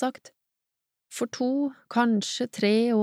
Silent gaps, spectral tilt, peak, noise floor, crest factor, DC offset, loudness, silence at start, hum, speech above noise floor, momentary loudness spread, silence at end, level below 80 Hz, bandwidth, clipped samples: none; -4.5 dB/octave; -10 dBFS; -86 dBFS; 16 dB; under 0.1%; -26 LUFS; 0 s; none; 60 dB; 10 LU; 0 s; -82 dBFS; 14.5 kHz; under 0.1%